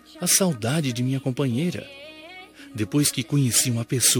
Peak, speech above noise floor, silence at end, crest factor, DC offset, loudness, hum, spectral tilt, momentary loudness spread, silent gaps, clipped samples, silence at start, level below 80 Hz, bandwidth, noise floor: -4 dBFS; 21 dB; 0 s; 18 dB; under 0.1%; -22 LUFS; none; -3.5 dB/octave; 21 LU; none; under 0.1%; 0.15 s; -64 dBFS; 19 kHz; -43 dBFS